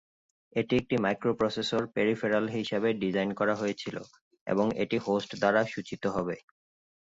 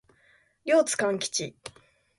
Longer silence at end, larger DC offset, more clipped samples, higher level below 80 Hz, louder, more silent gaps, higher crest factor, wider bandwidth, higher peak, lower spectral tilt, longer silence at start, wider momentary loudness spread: first, 0.65 s vs 0.5 s; neither; neither; first, -64 dBFS vs -70 dBFS; second, -29 LUFS vs -26 LUFS; first, 4.21-4.31 s, 4.41-4.46 s vs none; about the same, 18 dB vs 18 dB; second, 8 kHz vs 11.5 kHz; about the same, -12 dBFS vs -12 dBFS; first, -6 dB/octave vs -2.5 dB/octave; about the same, 0.55 s vs 0.65 s; second, 9 LU vs 21 LU